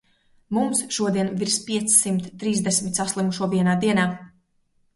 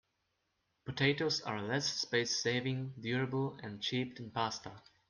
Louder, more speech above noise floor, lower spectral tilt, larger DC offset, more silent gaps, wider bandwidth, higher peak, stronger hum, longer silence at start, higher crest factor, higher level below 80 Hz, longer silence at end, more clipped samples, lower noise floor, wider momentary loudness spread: first, -22 LUFS vs -35 LUFS; about the same, 43 dB vs 46 dB; about the same, -4 dB/octave vs -4 dB/octave; neither; neither; first, 12 kHz vs 10.5 kHz; first, -4 dBFS vs -16 dBFS; neither; second, 0.5 s vs 0.85 s; about the same, 20 dB vs 20 dB; first, -60 dBFS vs -72 dBFS; first, 0.7 s vs 0.3 s; neither; second, -65 dBFS vs -82 dBFS; about the same, 8 LU vs 8 LU